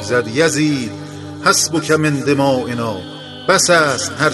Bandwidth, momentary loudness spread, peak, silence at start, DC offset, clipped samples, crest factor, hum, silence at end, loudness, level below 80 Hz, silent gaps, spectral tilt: 12.5 kHz; 15 LU; 0 dBFS; 0 s; under 0.1%; under 0.1%; 16 dB; none; 0 s; -15 LUFS; -54 dBFS; none; -3.5 dB/octave